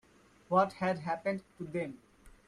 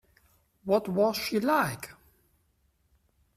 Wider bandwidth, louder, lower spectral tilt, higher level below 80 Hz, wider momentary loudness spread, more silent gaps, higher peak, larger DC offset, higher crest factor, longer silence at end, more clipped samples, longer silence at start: second, 11.5 kHz vs 16 kHz; second, -34 LUFS vs -27 LUFS; first, -7 dB/octave vs -5 dB/octave; about the same, -68 dBFS vs -64 dBFS; second, 12 LU vs 16 LU; neither; about the same, -14 dBFS vs -12 dBFS; neither; about the same, 22 dB vs 18 dB; second, 0.2 s vs 1.45 s; neither; second, 0.5 s vs 0.65 s